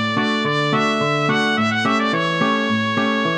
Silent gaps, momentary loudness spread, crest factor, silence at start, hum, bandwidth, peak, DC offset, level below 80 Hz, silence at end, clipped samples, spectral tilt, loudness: none; 1 LU; 14 dB; 0 s; none; 9.8 kHz; -4 dBFS; under 0.1%; -66 dBFS; 0 s; under 0.1%; -5 dB/octave; -18 LUFS